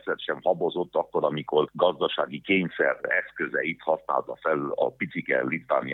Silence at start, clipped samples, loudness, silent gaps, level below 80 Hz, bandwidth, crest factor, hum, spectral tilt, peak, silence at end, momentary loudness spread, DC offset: 0.05 s; under 0.1%; -26 LUFS; none; -70 dBFS; 4.1 kHz; 20 dB; none; -8 dB/octave; -8 dBFS; 0 s; 5 LU; under 0.1%